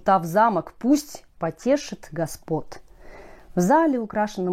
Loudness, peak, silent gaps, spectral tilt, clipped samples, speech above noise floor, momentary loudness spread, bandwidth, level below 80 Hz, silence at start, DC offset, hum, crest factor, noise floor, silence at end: -23 LUFS; -6 dBFS; none; -6 dB/octave; under 0.1%; 21 dB; 12 LU; 16 kHz; -52 dBFS; 0.05 s; under 0.1%; none; 16 dB; -43 dBFS; 0 s